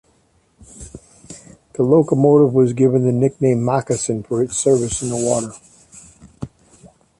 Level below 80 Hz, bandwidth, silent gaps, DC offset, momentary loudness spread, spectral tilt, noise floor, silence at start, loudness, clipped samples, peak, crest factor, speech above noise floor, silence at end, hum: -48 dBFS; 11.5 kHz; none; under 0.1%; 24 LU; -6.5 dB/octave; -59 dBFS; 0.8 s; -17 LUFS; under 0.1%; -2 dBFS; 16 dB; 43 dB; 0.35 s; none